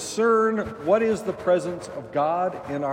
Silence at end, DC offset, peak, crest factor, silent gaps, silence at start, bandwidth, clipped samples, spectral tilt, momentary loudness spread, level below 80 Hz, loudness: 0 s; under 0.1%; -8 dBFS; 16 dB; none; 0 s; 15.5 kHz; under 0.1%; -5 dB/octave; 9 LU; -58 dBFS; -24 LUFS